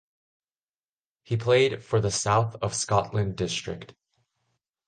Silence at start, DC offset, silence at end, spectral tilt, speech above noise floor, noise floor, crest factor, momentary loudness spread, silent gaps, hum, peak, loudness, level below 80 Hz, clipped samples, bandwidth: 1.3 s; under 0.1%; 0.95 s; -4.5 dB/octave; over 65 dB; under -90 dBFS; 20 dB; 10 LU; none; none; -8 dBFS; -25 LUFS; -52 dBFS; under 0.1%; 9.8 kHz